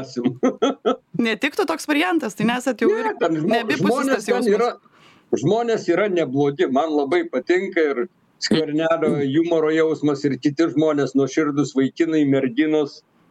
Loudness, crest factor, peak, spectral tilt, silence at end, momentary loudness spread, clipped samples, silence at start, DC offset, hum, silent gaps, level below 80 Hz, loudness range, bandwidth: -20 LUFS; 14 dB; -6 dBFS; -5.5 dB/octave; 0.3 s; 4 LU; under 0.1%; 0 s; under 0.1%; none; none; -66 dBFS; 1 LU; 14 kHz